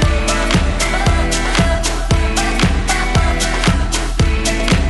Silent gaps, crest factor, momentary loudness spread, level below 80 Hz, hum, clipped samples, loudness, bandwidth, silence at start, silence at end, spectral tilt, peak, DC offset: none; 10 dB; 2 LU; -18 dBFS; none; under 0.1%; -16 LUFS; 12 kHz; 0 s; 0 s; -4 dB/octave; -4 dBFS; under 0.1%